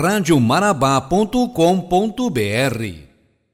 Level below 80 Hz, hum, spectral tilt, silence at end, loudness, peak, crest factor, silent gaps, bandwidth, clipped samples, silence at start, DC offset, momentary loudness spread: -44 dBFS; none; -5.5 dB/octave; 0.5 s; -17 LUFS; -4 dBFS; 12 dB; none; 16.5 kHz; under 0.1%; 0 s; under 0.1%; 5 LU